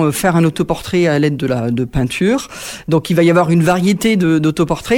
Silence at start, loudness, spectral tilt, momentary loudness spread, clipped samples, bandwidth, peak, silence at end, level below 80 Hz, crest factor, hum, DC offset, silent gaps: 0 s; -14 LUFS; -6 dB/octave; 6 LU; under 0.1%; 17 kHz; -2 dBFS; 0 s; -38 dBFS; 12 dB; none; under 0.1%; none